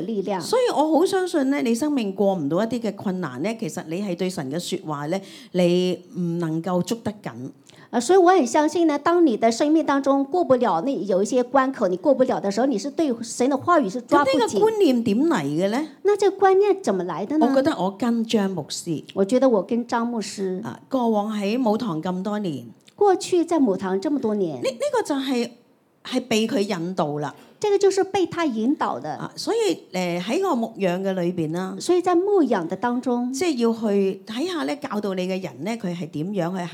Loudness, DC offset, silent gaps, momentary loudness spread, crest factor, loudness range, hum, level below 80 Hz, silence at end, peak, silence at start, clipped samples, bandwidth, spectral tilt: -22 LUFS; under 0.1%; none; 9 LU; 16 dB; 5 LU; none; -72 dBFS; 0 s; -6 dBFS; 0 s; under 0.1%; 16 kHz; -5.5 dB/octave